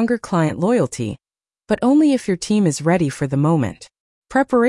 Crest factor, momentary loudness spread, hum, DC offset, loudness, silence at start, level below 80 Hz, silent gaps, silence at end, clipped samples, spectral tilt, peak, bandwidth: 12 dB; 10 LU; none; under 0.1%; -18 LUFS; 0 s; -52 dBFS; 4.00-4.22 s; 0 s; under 0.1%; -6.5 dB/octave; -6 dBFS; 12 kHz